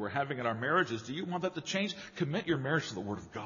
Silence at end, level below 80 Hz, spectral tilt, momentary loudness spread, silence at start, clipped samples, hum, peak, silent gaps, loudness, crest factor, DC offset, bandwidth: 0 s; -70 dBFS; -4 dB/octave; 8 LU; 0 s; under 0.1%; none; -14 dBFS; none; -34 LUFS; 20 dB; under 0.1%; 7.2 kHz